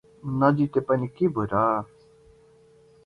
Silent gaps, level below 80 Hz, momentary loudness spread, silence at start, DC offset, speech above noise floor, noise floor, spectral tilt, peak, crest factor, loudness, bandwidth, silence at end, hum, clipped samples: none; -56 dBFS; 9 LU; 0.25 s; under 0.1%; 32 dB; -56 dBFS; -10 dB/octave; -6 dBFS; 20 dB; -24 LUFS; 5.6 kHz; 1.2 s; none; under 0.1%